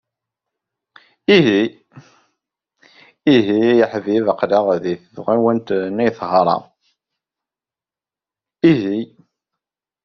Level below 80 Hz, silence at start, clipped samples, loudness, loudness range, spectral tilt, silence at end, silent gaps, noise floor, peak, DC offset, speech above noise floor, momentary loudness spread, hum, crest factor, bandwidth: -60 dBFS; 1.3 s; under 0.1%; -17 LUFS; 5 LU; -4.5 dB/octave; 1 s; none; under -90 dBFS; -2 dBFS; under 0.1%; over 75 dB; 10 LU; none; 18 dB; 6.4 kHz